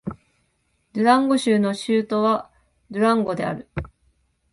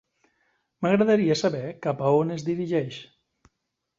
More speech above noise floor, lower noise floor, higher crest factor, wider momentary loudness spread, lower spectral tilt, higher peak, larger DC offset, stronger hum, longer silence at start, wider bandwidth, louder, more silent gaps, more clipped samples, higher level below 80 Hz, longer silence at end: second, 48 dB vs 57 dB; second, -68 dBFS vs -80 dBFS; about the same, 20 dB vs 18 dB; first, 16 LU vs 10 LU; about the same, -6 dB/octave vs -6.5 dB/octave; first, -4 dBFS vs -8 dBFS; neither; neither; second, 0.05 s vs 0.8 s; first, 11.5 kHz vs 7.8 kHz; first, -21 LUFS vs -24 LUFS; neither; neither; first, -50 dBFS vs -66 dBFS; second, 0.65 s vs 0.95 s